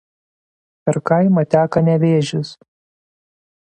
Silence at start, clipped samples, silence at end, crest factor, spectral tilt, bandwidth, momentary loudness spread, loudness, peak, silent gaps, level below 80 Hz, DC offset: 0.85 s; under 0.1%; 1.25 s; 18 dB; -7.5 dB/octave; 9.2 kHz; 10 LU; -16 LUFS; 0 dBFS; none; -56 dBFS; under 0.1%